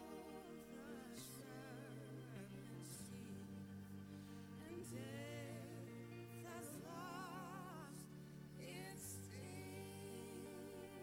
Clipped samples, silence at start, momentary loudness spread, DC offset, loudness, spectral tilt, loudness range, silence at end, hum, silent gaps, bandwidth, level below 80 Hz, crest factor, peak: under 0.1%; 0 s; 4 LU; under 0.1%; -54 LUFS; -5 dB/octave; 2 LU; 0 s; none; none; 18 kHz; -78 dBFS; 14 dB; -40 dBFS